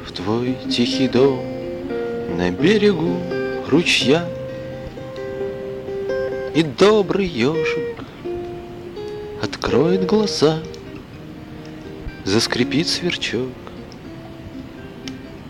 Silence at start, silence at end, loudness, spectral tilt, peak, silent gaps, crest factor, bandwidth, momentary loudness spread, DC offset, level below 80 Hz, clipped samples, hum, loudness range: 0 s; 0 s; -20 LUFS; -5 dB/octave; -2 dBFS; none; 18 dB; 16 kHz; 20 LU; under 0.1%; -44 dBFS; under 0.1%; none; 4 LU